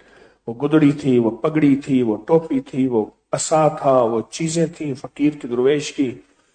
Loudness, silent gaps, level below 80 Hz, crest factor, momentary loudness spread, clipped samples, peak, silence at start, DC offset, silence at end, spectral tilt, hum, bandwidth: -19 LUFS; none; -58 dBFS; 16 dB; 9 LU; under 0.1%; -4 dBFS; 0.45 s; under 0.1%; 0.35 s; -6 dB/octave; none; 9.4 kHz